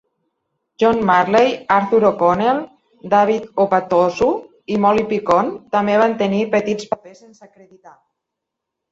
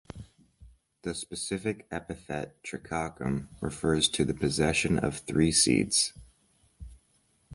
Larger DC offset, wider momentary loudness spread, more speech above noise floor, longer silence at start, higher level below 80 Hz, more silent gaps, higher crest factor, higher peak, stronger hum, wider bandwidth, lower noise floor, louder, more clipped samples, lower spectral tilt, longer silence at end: neither; second, 9 LU vs 15 LU; first, 64 dB vs 40 dB; first, 0.8 s vs 0.15 s; about the same, -54 dBFS vs -50 dBFS; neither; about the same, 16 dB vs 20 dB; first, -2 dBFS vs -10 dBFS; neither; second, 7.8 kHz vs 11.5 kHz; first, -81 dBFS vs -69 dBFS; first, -17 LUFS vs -28 LUFS; neither; first, -6.5 dB/octave vs -3.5 dB/octave; first, 1 s vs 0 s